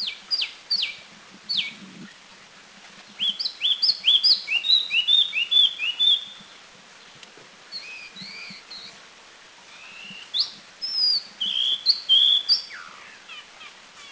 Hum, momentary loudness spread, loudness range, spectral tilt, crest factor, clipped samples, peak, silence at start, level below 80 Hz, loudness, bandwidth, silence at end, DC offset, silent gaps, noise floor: none; 23 LU; 20 LU; 0.5 dB/octave; 18 dB; under 0.1%; -8 dBFS; 0 s; -72 dBFS; -20 LUFS; 8 kHz; 0 s; under 0.1%; none; -48 dBFS